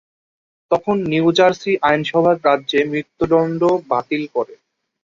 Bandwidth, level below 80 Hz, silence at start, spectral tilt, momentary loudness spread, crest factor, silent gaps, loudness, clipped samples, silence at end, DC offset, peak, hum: 7.4 kHz; -54 dBFS; 0.7 s; -6 dB/octave; 7 LU; 16 dB; none; -17 LUFS; under 0.1%; 0.5 s; under 0.1%; -2 dBFS; none